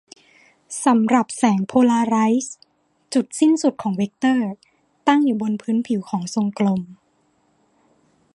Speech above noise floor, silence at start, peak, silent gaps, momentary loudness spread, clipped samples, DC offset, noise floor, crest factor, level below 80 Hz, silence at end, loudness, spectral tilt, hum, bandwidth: 44 dB; 0.7 s; -2 dBFS; none; 8 LU; under 0.1%; under 0.1%; -63 dBFS; 20 dB; -68 dBFS; 1.4 s; -20 LUFS; -5.5 dB/octave; none; 11.5 kHz